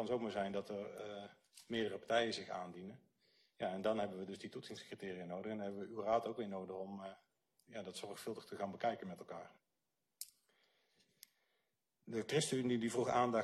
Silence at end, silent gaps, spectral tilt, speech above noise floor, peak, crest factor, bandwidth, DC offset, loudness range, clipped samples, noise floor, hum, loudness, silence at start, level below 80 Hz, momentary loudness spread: 0 s; none; -4.5 dB/octave; 48 dB; -22 dBFS; 22 dB; 13 kHz; under 0.1%; 6 LU; under 0.1%; -89 dBFS; none; -42 LUFS; 0 s; -80 dBFS; 16 LU